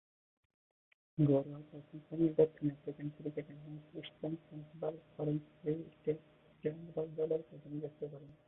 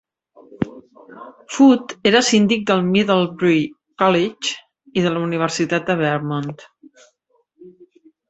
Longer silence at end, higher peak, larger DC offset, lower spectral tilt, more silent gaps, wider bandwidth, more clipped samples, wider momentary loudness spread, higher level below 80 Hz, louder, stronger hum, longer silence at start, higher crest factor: second, 0.15 s vs 0.6 s; second, -16 dBFS vs -2 dBFS; neither; first, -9 dB/octave vs -5 dB/octave; neither; second, 3.9 kHz vs 8.2 kHz; neither; first, 18 LU vs 14 LU; second, -74 dBFS vs -58 dBFS; second, -39 LUFS vs -18 LUFS; neither; first, 1.15 s vs 0.6 s; about the same, 22 dB vs 18 dB